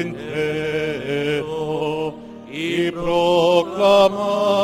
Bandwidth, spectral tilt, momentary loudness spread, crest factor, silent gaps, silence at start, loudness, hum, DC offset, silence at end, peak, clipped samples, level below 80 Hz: 16 kHz; -5.5 dB/octave; 11 LU; 16 dB; none; 0 s; -19 LUFS; none; under 0.1%; 0 s; -2 dBFS; under 0.1%; -50 dBFS